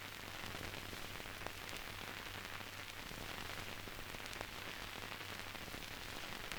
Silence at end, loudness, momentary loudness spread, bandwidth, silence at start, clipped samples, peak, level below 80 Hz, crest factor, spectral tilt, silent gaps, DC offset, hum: 0 s; -47 LUFS; 2 LU; over 20 kHz; 0 s; under 0.1%; -22 dBFS; -60 dBFS; 24 dB; -2.5 dB/octave; none; under 0.1%; none